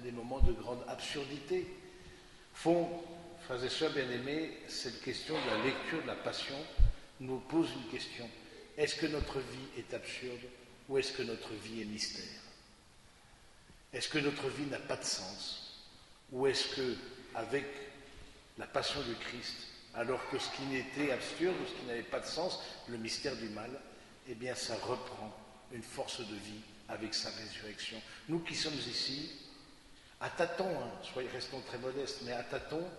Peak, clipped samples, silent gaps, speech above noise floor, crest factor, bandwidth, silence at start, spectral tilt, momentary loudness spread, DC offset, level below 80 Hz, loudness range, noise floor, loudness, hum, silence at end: -12 dBFS; under 0.1%; none; 23 dB; 26 dB; 11.5 kHz; 0 s; -4 dB/octave; 16 LU; under 0.1%; -46 dBFS; 4 LU; -61 dBFS; -39 LUFS; none; 0 s